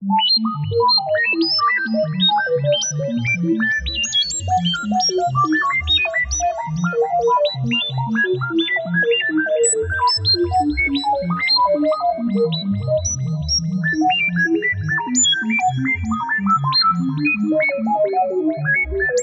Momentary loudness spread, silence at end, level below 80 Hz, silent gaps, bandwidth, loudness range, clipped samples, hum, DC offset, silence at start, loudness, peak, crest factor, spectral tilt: 5 LU; 0 s; -40 dBFS; none; 8.4 kHz; 2 LU; under 0.1%; none; under 0.1%; 0 s; -17 LUFS; -6 dBFS; 12 dB; -3.5 dB/octave